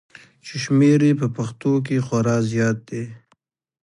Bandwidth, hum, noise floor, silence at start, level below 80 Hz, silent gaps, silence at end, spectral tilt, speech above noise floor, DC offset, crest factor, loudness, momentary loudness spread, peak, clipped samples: 11.5 kHz; none; -65 dBFS; 0.45 s; -60 dBFS; none; 0.65 s; -7 dB/octave; 46 dB; under 0.1%; 14 dB; -20 LUFS; 16 LU; -6 dBFS; under 0.1%